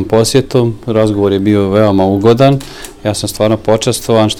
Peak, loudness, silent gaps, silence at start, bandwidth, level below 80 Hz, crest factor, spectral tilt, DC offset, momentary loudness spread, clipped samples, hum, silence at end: 0 dBFS; -11 LUFS; none; 0 s; 17.5 kHz; -36 dBFS; 10 dB; -6 dB/octave; under 0.1%; 7 LU; 0.3%; none; 0 s